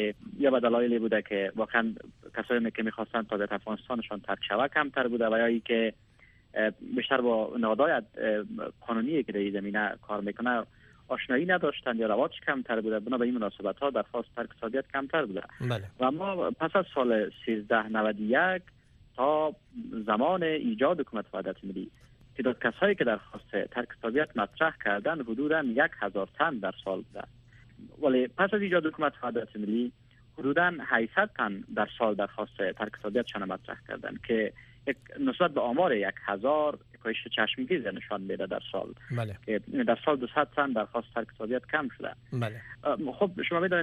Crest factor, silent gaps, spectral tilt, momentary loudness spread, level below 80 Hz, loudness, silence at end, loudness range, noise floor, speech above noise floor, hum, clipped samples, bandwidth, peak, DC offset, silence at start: 20 dB; none; -7.5 dB/octave; 10 LU; -64 dBFS; -30 LUFS; 0 s; 3 LU; -57 dBFS; 28 dB; none; under 0.1%; 6.6 kHz; -10 dBFS; under 0.1%; 0 s